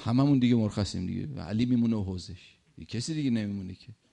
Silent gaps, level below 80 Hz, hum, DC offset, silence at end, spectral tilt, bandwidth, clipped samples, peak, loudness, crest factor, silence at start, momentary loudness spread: none; -58 dBFS; none; under 0.1%; 0.2 s; -7 dB/octave; 10.5 kHz; under 0.1%; -12 dBFS; -29 LUFS; 16 dB; 0 s; 17 LU